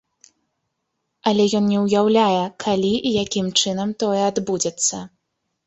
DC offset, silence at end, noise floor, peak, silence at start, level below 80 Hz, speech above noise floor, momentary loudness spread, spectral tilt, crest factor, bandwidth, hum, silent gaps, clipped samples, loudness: under 0.1%; 0.6 s; -76 dBFS; -2 dBFS; 1.25 s; -58 dBFS; 57 dB; 6 LU; -4 dB/octave; 18 dB; 8.4 kHz; none; none; under 0.1%; -19 LUFS